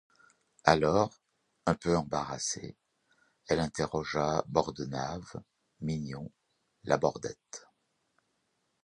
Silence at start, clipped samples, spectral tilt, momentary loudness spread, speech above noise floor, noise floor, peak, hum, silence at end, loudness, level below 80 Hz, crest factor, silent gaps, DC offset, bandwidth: 0.65 s; under 0.1%; -5 dB/octave; 20 LU; 47 dB; -78 dBFS; -4 dBFS; none; 1.25 s; -32 LUFS; -56 dBFS; 30 dB; none; under 0.1%; 11 kHz